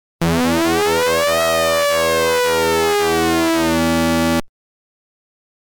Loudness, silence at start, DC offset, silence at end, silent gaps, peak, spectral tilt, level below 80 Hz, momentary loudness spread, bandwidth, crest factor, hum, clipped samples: -16 LUFS; 0.2 s; under 0.1%; 1.35 s; none; -10 dBFS; -4 dB/octave; -40 dBFS; 2 LU; 19.5 kHz; 8 dB; none; under 0.1%